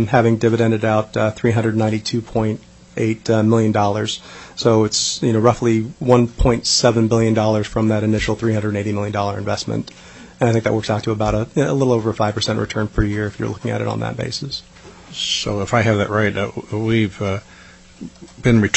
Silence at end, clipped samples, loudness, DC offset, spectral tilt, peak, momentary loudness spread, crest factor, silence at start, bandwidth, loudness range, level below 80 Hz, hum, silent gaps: 0 s; under 0.1%; -18 LUFS; under 0.1%; -5.5 dB/octave; 0 dBFS; 9 LU; 18 dB; 0 s; 8.4 kHz; 5 LU; -36 dBFS; none; none